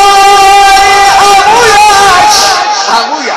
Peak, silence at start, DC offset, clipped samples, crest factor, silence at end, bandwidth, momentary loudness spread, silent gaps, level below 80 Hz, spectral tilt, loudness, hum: 0 dBFS; 0 s; under 0.1%; 5%; 4 dB; 0 s; 16.5 kHz; 6 LU; none; -32 dBFS; -0.5 dB/octave; -3 LUFS; none